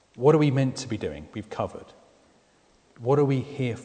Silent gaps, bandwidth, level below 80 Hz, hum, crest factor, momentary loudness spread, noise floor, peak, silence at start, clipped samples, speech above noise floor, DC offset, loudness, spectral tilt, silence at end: none; 9.4 kHz; -58 dBFS; none; 20 dB; 15 LU; -62 dBFS; -6 dBFS; 0.15 s; under 0.1%; 37 dB; under 0.1%; -25 LUFS; -7.5 dB/octave; 0 s